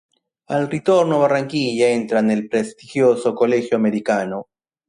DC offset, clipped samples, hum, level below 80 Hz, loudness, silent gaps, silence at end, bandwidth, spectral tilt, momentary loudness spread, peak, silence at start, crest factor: under 0.1%; under 0.1%; none; -64 dBFS; -19 LUFS; none; 0.45 s; 11 kHz; -6 dB/octave; 7 LU; -4 dBFS; 0.5 s; 14 dB